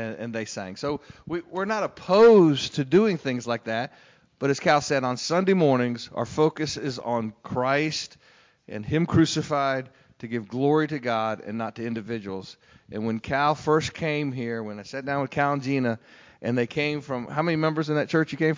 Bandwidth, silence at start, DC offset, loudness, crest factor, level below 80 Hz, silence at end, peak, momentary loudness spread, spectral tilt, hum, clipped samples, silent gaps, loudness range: 7.6 kHz; 0 s; under 0.1%; -25 LUFS; 16 dB; -56 dBFS; 0 s; -8 dBFS; 12 LU; -6 dB/octave; none; under 0.1%; none; 6 LU